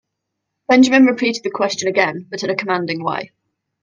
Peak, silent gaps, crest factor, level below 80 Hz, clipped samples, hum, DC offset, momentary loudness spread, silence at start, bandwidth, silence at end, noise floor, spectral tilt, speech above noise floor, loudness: 0 dBFS; none; 18 dB; -64 dBFS; under 0.1%; none; under 0.1%; 13 LU; 0.7 s; 7.6 kHz; 0.6 s; -77 dBFS; -4 dB/octave; 61 dB; -16 LUFS